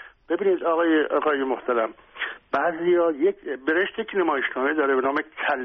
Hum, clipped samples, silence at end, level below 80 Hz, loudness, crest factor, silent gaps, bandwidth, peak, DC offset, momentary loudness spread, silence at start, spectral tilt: none; under 0.1%; 0 s; -64 dBFS; -23 LUFS; 14 dB; none; 5.6 kHz; -10 dBFS; under 0.1%; 8 LU; 0 s; -2 dB/octave